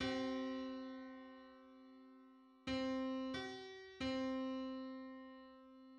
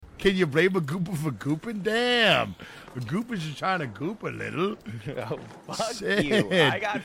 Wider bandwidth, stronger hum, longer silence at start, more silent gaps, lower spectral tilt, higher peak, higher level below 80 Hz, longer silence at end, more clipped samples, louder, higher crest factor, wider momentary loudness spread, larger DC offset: second, 9.2 kHz vs 16.5 kHz; neither; about the same, 0 s vs 0 s; neither; about the same, -5 dB/octave vs -5 dB/octave; second, -30 dBFS vs -8 dBFS; second, -70 dBFS vs -54 dBFS; about the same, 0 s vs 0 s; neither; second, -45 LUFS vs -26 LUFS; about the same, 16 dB vs 18 dB; first, 20 LU vs 15 LU; neither